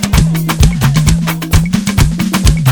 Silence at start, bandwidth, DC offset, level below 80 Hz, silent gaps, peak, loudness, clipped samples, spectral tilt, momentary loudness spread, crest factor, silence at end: 0 s; over 20 kHz; under 0.1%; -16 dBFS; none; 0 dBFS; -12 LUFS; 0.8%; -5 dB/octave; 3 LU; 10 dB; 0 s